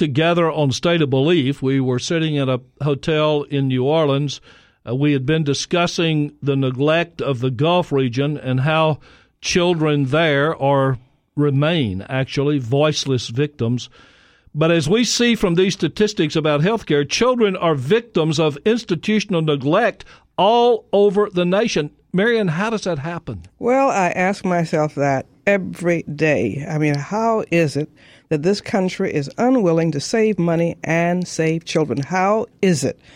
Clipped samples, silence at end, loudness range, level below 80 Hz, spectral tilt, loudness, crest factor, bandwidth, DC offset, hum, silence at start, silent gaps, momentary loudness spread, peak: under 0.1%; 0.25 s; 2 LU; -52 dBFS; -5.5 dB/octave; -18 LUFS; 16 dB; 14.5 kHz; under 0.1%; none; 0 s; none; 6 LU; -2 dBFS